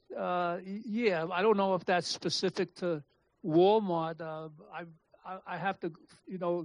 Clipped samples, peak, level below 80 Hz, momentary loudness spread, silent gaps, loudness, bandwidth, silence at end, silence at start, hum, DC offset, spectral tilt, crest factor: under 0.1%; -14 dBFS; -76 dBFS; 19 LU; none; -31 LUFS; 10.5 kHz; 0 s; 0.1 s; none; under 0.1%; -5.5 dB/octave; 18 dB